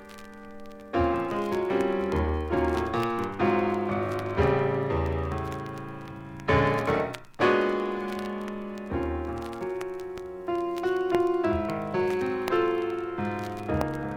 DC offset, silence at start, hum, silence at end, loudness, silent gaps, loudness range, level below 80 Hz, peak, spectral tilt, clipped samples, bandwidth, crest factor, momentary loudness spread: under 0.1%; 0 s; none; 0 s; -28 LUFS; none; 3 LU; -44 dBFS; -8 dBFS; -7 dB/octave; under 0.1%; 16 kHz; 20 dB; 12 LU